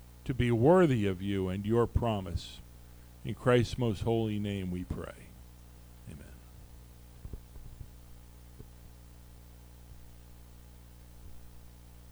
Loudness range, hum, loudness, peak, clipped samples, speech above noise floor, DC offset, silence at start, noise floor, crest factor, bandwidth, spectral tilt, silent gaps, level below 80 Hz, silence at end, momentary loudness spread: 24 LU; 60 Hz at -50 dBFS; -30 LUFS; -12 dBFS; under 0.1%; 23 dB; under 0.1%; 0 s; -52 dBFS; 22 dB; over 20 kHz; -7.5 dB/octave; none; -48 dBFS; 0 s; 27 LU